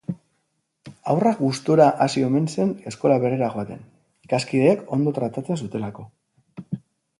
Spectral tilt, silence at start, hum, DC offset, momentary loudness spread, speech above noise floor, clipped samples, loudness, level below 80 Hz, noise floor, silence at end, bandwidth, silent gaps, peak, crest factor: -7 dB/octave; 0.1 s; none; under 0.1%; 18 LU; 52 dB; under 0.1%; -21 LUFS; -62 dBFS; -73 dBFS; 0.45 s; 11.5 kHz; none; -4 dBFS; 20 dB